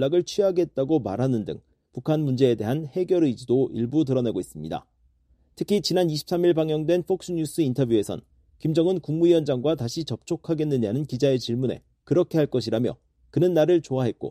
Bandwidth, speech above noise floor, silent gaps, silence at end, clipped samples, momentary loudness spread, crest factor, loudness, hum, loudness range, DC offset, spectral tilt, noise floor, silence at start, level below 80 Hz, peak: 14.5 kHz; 39 dB; none; 0 s; under 0.1%; 10 LU; 16 dB; -24 LUFS; none; 2 LU; under 0.1%; -7 dB/octave; -63 dBFS; 0 s; -58 dBFS; -6 dBFS